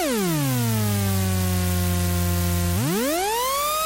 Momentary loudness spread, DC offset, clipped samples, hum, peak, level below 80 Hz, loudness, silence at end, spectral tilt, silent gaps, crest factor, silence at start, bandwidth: 0 LU; under 0.1%; under 0.1%; none; -14 dBFS; -38 dBFS; -22 LUFS; 0 s; -4.5 dB/octave; none; 8 dB; 0 s; 16 kHz